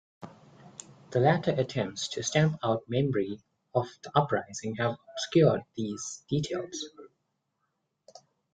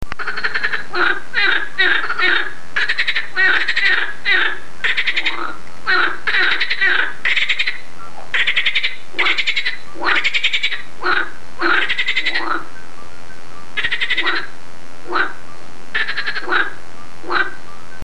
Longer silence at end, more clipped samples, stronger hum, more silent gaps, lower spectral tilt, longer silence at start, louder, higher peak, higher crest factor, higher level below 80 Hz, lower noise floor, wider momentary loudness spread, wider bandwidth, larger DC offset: first, 1.45 s vs 0 s; neither; neither; neither; first, -5.5 dB/octave vs -2.5 dB/octave; first, 0.2 s vs 0 s; second, -29 LUFS vs -17 LUFS; second, -8 dBFS vs 0 dBFS; about the same, 22 dB vs 18 dB; second, -64 dBFS vs -50 dBFS; first, -79 dBFS vs -40 dBFS; first, 20 LU vs 10 LU; second, 9.2 kHz vs 13 kHz; second, under 0.1% vs 10%